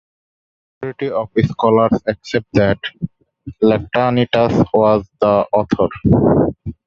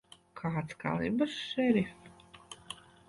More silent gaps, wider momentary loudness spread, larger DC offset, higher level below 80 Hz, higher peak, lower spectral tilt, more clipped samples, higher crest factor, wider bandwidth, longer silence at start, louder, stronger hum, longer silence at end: neither; second, 10 LU vs 20 LU; neither; first, -38 dBFS vs -64 dBFS; first, 0 dBFS vs -16 dBFS; first, -8 dB/octave vs -6 dB/octave; neither; about the same, 16 dB vs 18 dB; second, 7.4 kHz vs 11.5 kHz; first, 0.8 s vs 0.35 s; first, -16 LUFS vs -33 LUFS; neither; second, 0.15 s vs 0.35 s